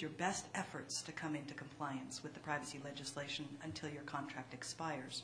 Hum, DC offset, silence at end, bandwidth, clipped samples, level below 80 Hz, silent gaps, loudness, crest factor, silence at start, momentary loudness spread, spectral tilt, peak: none; under 0.1%; 0 s; 10.5 kHz; under 0.1%; -78 dBFS; none; -45 LUFS; 22 dB; 0 s; 6 LU; -3.5 dB/octave; -22 dBFS